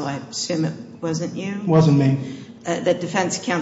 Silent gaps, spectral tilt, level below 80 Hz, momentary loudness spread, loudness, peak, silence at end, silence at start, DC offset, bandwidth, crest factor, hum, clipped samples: none; -6 dB/octave; -60 dBFS; 11 LU; -21 LUFS; -6 dBFS; 0 s; 0 s; under 0.1%; 8 kHz; 14 dB; none; under 0.1%